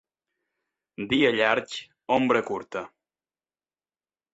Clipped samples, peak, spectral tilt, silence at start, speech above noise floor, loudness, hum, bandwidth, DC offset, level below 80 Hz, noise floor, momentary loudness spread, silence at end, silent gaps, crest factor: under 0.1%; -6 dBFS; -5 dB/octave; 1 s; over 65 dB; -24 LUFS; none; 8.2 kHz; under 0.1%; -64 dBFS; under -90 dBFS; 16 LU; 1.45 s; none; 22 dB